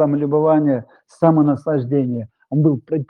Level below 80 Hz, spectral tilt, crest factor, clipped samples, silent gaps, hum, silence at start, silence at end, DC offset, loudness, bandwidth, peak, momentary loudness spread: -64 dBFS; -11 dB/octave; 16 dB; under 0.1%; none; none; 0 s; 0.05 s; under 0.1%; -18 LUFS; 4 kHz; -2 dBFS; 9 LU